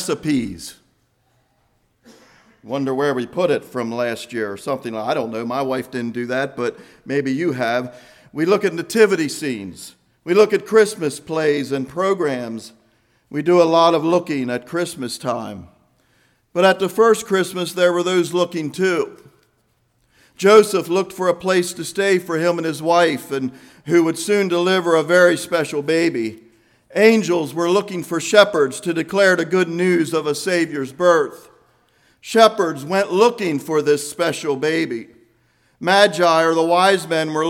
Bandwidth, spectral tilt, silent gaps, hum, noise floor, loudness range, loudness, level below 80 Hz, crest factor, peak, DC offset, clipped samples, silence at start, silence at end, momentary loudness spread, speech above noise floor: 16.5 kHz; -4.5 dB/octave; none; none; -63 dBFS; 6 LU; -18 LUFS; -64 dBFS; 18 dB; 0 dBFS; under 0.1%; under 0.1%; 0 s; 0 s; 12 LU; 46 dB